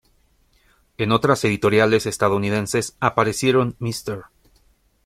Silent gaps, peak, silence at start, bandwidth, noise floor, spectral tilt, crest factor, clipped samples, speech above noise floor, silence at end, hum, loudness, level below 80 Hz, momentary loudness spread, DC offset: none; -2 dBFS; 1 s; 16 kHz; -60 dBFS; -5 dB/octave; 18 dB; under 0.1%; 41 dB; 0.85 s; none; -20 LUFS; -52 dBFS; 10 LU; under 0.1%